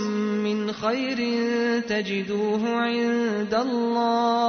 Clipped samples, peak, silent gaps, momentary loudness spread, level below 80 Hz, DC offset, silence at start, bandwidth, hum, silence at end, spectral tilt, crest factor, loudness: under 0.1%; -12 dBFS; none; 3 LU; -64 dBFS; under 0.1%; 0 s; 6.6 kHz; none; 0 s; -5.5 dB/octave; 12 dB; -24 LUFS